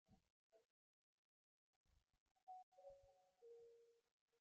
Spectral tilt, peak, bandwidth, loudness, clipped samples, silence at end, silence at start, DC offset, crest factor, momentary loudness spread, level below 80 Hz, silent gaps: -4.5 dB/octave; -52 dBFS; 7 kHz; -66 LUFS; under 0.1%; 0 s; 0.05 s; under 0.1%; 18 dB; 4 LU; under -90 dBFS; 0.30-0.50 s, 0.65-1.85 s, 2.20-2.35 s, 2.43-2.47 s, 2.63-2.72 s, 4.11-4.28 s